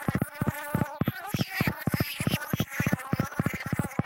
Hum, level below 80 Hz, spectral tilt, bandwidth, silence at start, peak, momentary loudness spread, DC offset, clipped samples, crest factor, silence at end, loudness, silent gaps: none; -50 dBFS; -5.5 dB/octave; 17 kHz; 0 s; -10 dBFS; 3 LU; under 0.1%; under 0.1%; 18 dB; 0 s; -30 LUFS; none